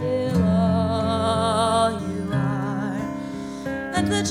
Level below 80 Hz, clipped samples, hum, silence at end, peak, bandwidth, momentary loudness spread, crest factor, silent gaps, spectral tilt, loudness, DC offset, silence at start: -46 dBFS; under 0.1%; none; 0 s; -8 dBFS; 14.5 kHz; 10 LU; 14 dB; none; -6 dB/octave; -23 LUFS; under 0.1%; 0 s